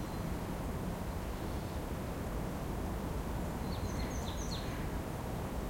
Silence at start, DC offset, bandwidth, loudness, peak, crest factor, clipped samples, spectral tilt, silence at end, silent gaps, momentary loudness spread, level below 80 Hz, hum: 0 s; under 0.1%; 16.5 kHz; -40 LUFS; -26 dBFS; 12 dB; under 0.1%; -6 dB/octave; 0 s; none; 2 LU; -44 dBFS; none